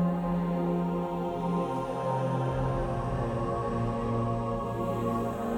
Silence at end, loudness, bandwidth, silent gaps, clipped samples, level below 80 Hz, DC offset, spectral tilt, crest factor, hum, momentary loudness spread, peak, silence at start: 0 s; -31 LUFS; 13 kHz; none; under 0.1%; -44 dBFS; under 0.1%; -8.5 dB/octave; 12 dB; none; 3 LU; -18 dBFS; 0 s